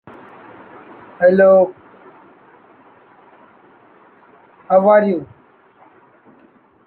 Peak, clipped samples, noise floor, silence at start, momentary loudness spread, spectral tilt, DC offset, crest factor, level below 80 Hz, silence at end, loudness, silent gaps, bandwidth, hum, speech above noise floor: -2 dBFS; under 0.1%; -51 dBFS; 1.2 s; 10 LU; -10 dB/octave; under 0.1%; 18 dB; -68 dBFS; 1.6 s; -14 LUFS; none; 4.4 kHz; none; 40 dB